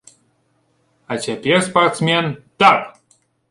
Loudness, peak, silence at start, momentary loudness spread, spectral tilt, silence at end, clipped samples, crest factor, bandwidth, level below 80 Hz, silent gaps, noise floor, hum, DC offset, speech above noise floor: -16 LUFS; 0 dBFS; 1.1 s; 13 LU; -4.5 dB/octave; 0.6 s; under 0.1%; 18 dB; 11.5 kHz; -58 dBFS; none; -63 dBFS; none; under 0.1%; 47 dB